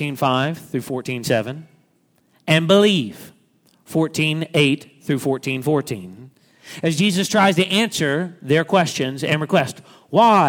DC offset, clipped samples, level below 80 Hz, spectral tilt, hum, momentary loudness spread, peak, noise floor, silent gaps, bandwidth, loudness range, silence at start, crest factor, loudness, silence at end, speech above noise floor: under 0.1%; under 0.1%; -64 dBFS; -5 dB/octave; none; 13 LU; -2 dBFS; -61 dBFS; none; 19 kHz; 3 LU; 0 s; 18 dB; -19 LUFS; 0 s; 43 dB